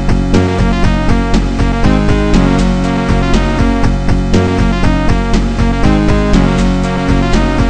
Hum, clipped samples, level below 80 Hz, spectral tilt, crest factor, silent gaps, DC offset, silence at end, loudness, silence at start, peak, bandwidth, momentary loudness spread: none; under 0.1%; -14 dBFS; -6.5 dB/octave; 10 dB; none; under 0.1%; 0 s; -12 LUFS; 0 s; 0 dBFS; 9.4 kHz; 3 LU